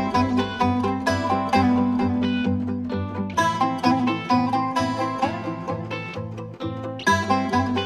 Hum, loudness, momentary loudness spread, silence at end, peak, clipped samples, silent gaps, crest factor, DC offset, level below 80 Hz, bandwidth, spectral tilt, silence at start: none; -23 LUFS; 10 LU; 0 s; -6 dBFS; under 0.1%; none; 16 dB; under 0.1%; -52 dBFS; 12.5 kHz; -6 dB/octave; 0 s